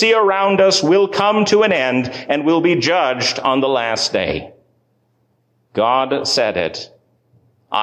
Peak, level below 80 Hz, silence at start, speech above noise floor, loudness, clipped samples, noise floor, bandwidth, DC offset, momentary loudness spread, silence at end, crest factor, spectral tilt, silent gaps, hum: -4 dBFS; -52 dBFS; 0 s; 47 dB; -16 LUFS; under 0.1%; -62 dBFS; 10 kHz; under 0.1%; 10 LU; 0 s; 14 dB; -4 dB/octave; none; none